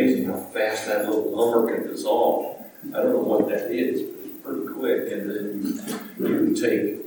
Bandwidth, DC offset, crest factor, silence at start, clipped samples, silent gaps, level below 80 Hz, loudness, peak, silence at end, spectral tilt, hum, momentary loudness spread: 17 kHz; under 0.1%; 18 dB; 0 s; under 0.1%; none; -78 dBFS; -24 LUFS; -6 dBFS; 0 s; -5.5 dB/octave; none; 10 LU